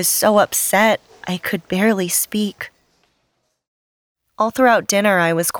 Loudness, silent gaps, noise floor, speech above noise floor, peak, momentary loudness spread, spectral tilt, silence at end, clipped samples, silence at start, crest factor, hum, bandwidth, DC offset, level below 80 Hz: -17 LUFS; 3.67-4.15 s; -69 dBFS; 52 dB; -2 dBFS; 11 LU; -3 dB/octave; 0 s; under 0.1%; 0 s; 16 dB; none; over 20 kHz; under 0.1%; -60 dBFS